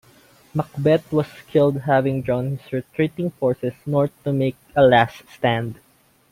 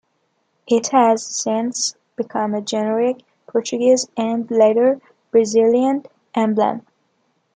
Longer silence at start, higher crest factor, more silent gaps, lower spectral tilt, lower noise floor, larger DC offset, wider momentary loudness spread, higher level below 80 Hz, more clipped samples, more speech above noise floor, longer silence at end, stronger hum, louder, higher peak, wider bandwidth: second, 0.55 s vs 0.7 s; about the same, 18 dB vs 16 dB; neither; first, -8 dB/octave vs -4 dB/octave; second, -52 dBFS vs -67 dBFS; neither; about the same, 10 LU vs 11 LU; first, -54 dBFS vs -70 dBFS; neither; second, 32 dB vs 50 dB; second, 0.6 s vs 0.75 s; neither; second, -21 LUFS vs -18 LUFS; about the same, -2 dBFS vs -2 dBFS; first, 16 kHz vs 9.4 kHz